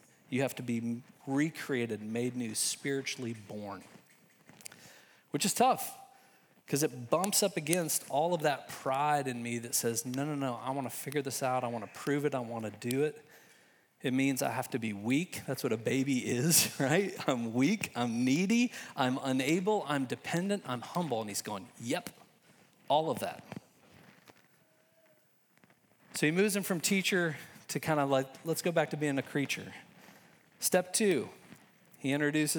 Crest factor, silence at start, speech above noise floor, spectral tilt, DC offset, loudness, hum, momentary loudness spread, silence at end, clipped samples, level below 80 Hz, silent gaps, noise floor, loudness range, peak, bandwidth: 28 dB; 0.3 s; 36 dB; -4 dB/octave; under 0.1%; -32 LUFS; none; 11 LU; 0 s; under 0.1%; -82 dBFS; none; -68 dBFS; 7 LU; -6 dBFS; over 20 kHz